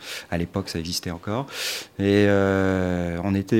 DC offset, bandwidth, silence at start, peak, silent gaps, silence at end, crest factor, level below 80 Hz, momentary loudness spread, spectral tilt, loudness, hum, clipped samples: under 0.1%; 16.5 kHz; 0 s; -6 dBFS; none; 0 s; 18 dB; -48 dBFS; 10 LU; -5.5 dB/octave; -24 LUFS; none; under 0.1%